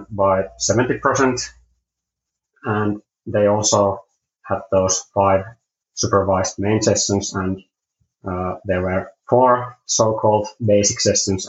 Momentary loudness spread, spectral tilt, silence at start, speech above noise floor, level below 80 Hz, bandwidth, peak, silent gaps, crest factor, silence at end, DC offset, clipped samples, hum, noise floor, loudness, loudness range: 11 LU; -4 dB/octave; 0 s; 64 dB; -52 dBFS; 8.2 kHz; -2 dBFS; none; 18 dB; 0 s; under 0.1%; under 0.1%; none; -83 dBFS; -19 LUFS; 3 LU